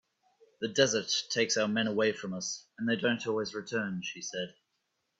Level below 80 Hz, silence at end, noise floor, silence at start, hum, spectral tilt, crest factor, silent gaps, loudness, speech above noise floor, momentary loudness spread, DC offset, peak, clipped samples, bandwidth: -74 dBFS; 0.7 s; -80 dBFS; 0.6 s; none; -3 dB/octave; 22 dB; none; -31 LUFS; 49 dB; 10 LU; under 0.1%; -10 dBFS; under 0.1%; 8 kHz